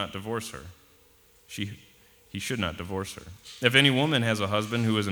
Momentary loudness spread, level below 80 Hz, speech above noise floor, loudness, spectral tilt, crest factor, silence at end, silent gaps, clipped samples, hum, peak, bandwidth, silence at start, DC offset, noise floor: 21 LU; -58 dBFS; 32 dB; -26 LUFS; -4.5 dB/octave; 24 dB; 0 s; none; under 0.1%; none; -4 dBFS; over 20 kHz; 0 s; under 0.1%; -59 dBFS